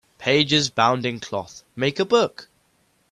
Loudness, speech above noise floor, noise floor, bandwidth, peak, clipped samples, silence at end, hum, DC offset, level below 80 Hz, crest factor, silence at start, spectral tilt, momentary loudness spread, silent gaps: -21 LUFS; 43 dB; -64 dBFS; 12 kHz; -4 dBFS; under 0.1%; 0.65 s; none; under 0.1%; -60 dBFS; 20 dB; 0.2 s; -4 dB/octave; 13 LU; none